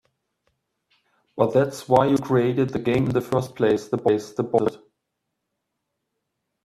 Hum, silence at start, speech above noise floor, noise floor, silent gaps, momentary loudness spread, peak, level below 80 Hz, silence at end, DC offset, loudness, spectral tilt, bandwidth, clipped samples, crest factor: none; 1.35 s; 59 dB; -80 dBFS; none; 5 LU; -2 dBFS; -58 dBFS; 1.85 s; under 0.1%; -22 LUFS; -7 dB/octave; 14.5 kHz; under 0.1%; 22 dB